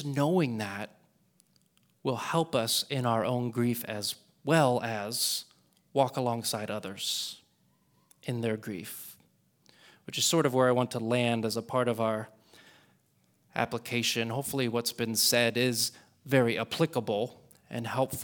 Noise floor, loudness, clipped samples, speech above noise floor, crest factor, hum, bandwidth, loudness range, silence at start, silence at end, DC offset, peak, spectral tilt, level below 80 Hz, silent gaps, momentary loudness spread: -69 dBFS; -29 LUFS; under 0.1%; 40 dB; 22 dB; none; over 20 kHz; 5 LU; 0 s; 0 s; under 0.1%; -10 dBFS; -4 dB/octave; -72 dBFS; none; 13 LU